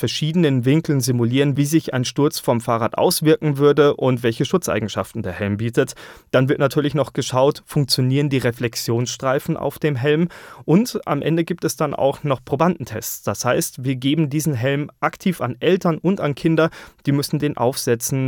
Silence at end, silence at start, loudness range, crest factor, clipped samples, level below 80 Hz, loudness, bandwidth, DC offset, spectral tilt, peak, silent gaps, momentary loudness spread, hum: 0 s; 0 s; 3 LU; 16 dB; under 0.1%; -54 dBFS; -20 LUFS; over 20 kHz; under 0.1%; -5.5 dB/octave; -2 dBFS; none; 7 LU; none